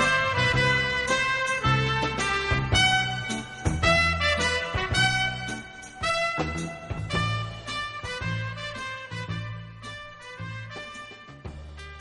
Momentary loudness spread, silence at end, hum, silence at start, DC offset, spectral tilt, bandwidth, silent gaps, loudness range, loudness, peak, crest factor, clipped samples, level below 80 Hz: 18 LU; 0 s; none; 0 s; under 0.1%; -3.5 dB/octave; 11.5 kHz; none; 11 LU; -25 LUFS; -8 dBFS; 18 dB; under 0.1%; -42 dBFS